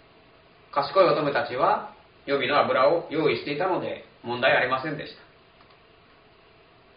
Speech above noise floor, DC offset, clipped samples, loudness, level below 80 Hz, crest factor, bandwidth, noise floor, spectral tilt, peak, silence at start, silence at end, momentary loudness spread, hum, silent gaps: 32 dB; under 0.1%; under 0.1%; -24 LUFS; -66 dBFS; 20 dB; 5.2 kHz; -55 dBFS; -2.5 dB/octave; -6 dBFS; 0.75 s; 1.85 s; 15 LU; none; none